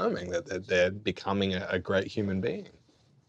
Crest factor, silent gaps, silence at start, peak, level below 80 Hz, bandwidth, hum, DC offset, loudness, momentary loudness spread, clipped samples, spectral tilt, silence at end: 18 dB; none; 0 s; -14 dBFS; -66 dBFS; 8.2 kHz; none; under 0.1%; -30 LUFS; 7 LU; under 0.1%; -5.5 dB/octave; 0.6 s